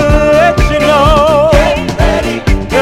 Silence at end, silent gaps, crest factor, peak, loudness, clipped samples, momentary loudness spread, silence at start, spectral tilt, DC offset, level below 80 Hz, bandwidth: 0 s; none; 8 dB; 0 dBFS; -9 LUFS; 0.6%; 6 LU; 0 s; -5.5 dB/octave; under 0.1%; -16 dBFS; 15.5 kHz